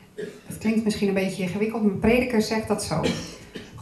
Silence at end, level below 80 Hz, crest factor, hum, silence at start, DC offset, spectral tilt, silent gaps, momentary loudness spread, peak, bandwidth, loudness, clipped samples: 0 s; -46 dBFS; 18 dB; none; 0.15 s; under 0.1%; -5.5 dB/octave; none; 17 LU; -8 dBFS; 14 kHz; -24 LUFS; under 0.1%